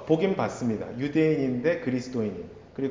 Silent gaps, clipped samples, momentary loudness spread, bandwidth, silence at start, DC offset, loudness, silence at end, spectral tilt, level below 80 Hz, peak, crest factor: none; under 0.1%; 9 LU; 7.6 kHz; 0 s; under 0.1%; -27 LUFS; 0 s; -7 dB/octave; -58 dBFS; -8 dBFS; 18 dB